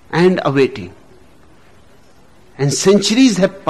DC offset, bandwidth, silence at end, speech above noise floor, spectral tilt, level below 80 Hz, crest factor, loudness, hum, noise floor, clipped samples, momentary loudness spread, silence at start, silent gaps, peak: 0.5%; 13 kHz; 0 s; 35 dB; -5 dB/octave; -50 dBFS; 14 dB; -14 LUFS; none; -48 dBFS; under 0.1%; 11 LU; 0.1 s; none; -4 dBFS